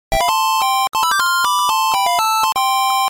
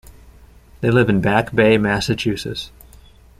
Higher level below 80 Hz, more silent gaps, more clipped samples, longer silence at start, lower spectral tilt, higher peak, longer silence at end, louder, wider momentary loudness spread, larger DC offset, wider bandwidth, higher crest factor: about the same, -38 dBFS vs -42 dBFS; neither; neither; second, 0.1 s vs 0.8 s; second, 0.5 dB/octave vs -6 dB/octave; second, -6 dBFS vs -2 dBFS; second, 0 s vs 0.7 s; about the same, -15 LUFS vs -17 LUFS; second, 1 LU vs 13 LU; neither; first, 17 kHz vs 15 kHz; second, 10 dB vs 18 dB